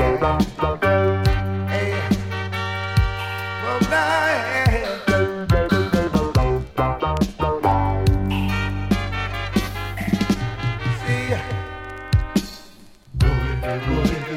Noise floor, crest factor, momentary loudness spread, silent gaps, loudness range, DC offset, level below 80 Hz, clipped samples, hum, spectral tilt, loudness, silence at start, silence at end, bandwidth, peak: -45 dBFS; 16 dB; 7 LU; none; 4 LU; under 0.1%; -30 dBFS; under 0.1%; none; -6.5 dB/octave; -21 LUFS; 0 s; 0 s; 16 kHz; -4 dBFS